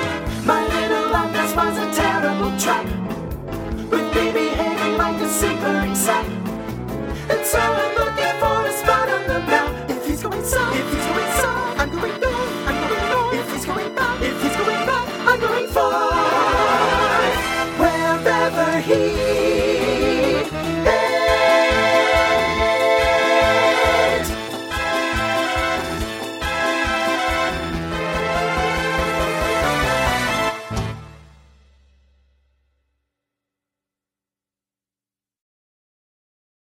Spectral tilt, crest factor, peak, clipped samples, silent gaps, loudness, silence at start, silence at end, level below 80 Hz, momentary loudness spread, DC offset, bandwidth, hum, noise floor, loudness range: -4 dB/octave; 20 dB; 0 dBFS; under 0.1%; none; -19 LUFS; 0 s; 5.55 s; -36 dBFS; 9 LU; under 0.1%; 19.5 kHz; none; under -90 dBFS; 5 LU